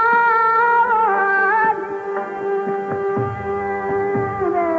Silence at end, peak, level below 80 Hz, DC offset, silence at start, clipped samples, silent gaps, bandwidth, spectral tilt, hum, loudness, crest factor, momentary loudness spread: 0 s; -6 dBFS; -56 dBFS; under 0.1%; 0 s; under 0.1%; none; 7 kHz; -8 dB/octave; none; -18 LUFS; 12 dB; 9 LU